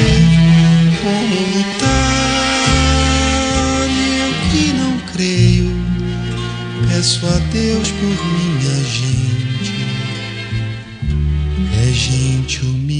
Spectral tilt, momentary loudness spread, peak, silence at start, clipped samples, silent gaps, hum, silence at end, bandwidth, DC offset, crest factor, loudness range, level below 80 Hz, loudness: -5 dB/octave; 9 LU; 0 dBFS; 0 s; under 0.1%; none; none; 0 s; 10 kHz; 0.1%; 14 dB; 5 LU; -26 dBFS; -15 LUFS